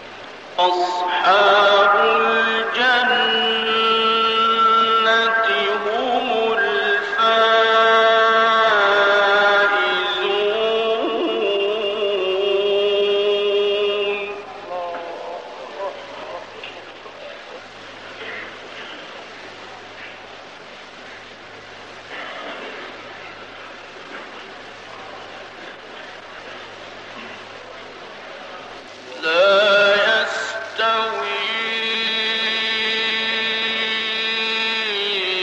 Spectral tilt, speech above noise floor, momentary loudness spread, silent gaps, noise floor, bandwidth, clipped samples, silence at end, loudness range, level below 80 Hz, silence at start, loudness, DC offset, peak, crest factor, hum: -2.5 dB/octave; 23 dB; 22 LU; none; -38 dBFS; 9.2 kHz; under 0.1%; 0 s; 20 LU; -66 dBFS; 0 s; -17 LUFS; 0.1%; -4 dBFS; 16 dB; none